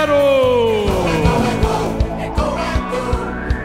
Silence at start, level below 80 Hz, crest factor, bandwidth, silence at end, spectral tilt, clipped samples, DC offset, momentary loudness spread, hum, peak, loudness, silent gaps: 0 s; -24 dBFS; 14 dB; 16 kHz; 0 s; -6 dB/octave; under 0.1%; under 0.1%; 8 LU; none; -2 dBFS; -17 LUFS; none